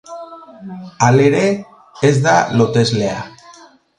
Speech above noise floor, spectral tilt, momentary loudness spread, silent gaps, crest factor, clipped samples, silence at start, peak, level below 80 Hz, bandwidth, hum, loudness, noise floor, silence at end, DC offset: 30 dB; -5.5 dB/octave; 21 LU; none; 16 dB; under 0.1%; 0.1 s; 0 dBFS; -50 dBFS; 10.5 kHz; none; -14 LUFS; -44 dBFS; 0.7 s; under 0.1%